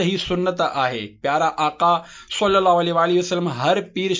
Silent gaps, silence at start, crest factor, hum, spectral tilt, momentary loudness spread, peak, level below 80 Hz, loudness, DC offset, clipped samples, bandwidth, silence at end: none; 0 s; 16 dB; none; -5 dB/octave; 6 LU; -4 dBFS; -52 dBFS; -20 LUFS; under 0.1%; under 0.1%; 7.6 kHz; 0 s